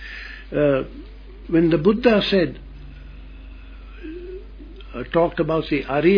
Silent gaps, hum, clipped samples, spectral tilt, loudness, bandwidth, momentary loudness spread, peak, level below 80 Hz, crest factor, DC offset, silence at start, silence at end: none; none; under 0.1%; -8.5 dB/octave; -20 LUFS; 5.4 kHz; 25 LU; -2 dBFS; -38 dBFS; 18 dB; under 0.1%; 0 s; 0 s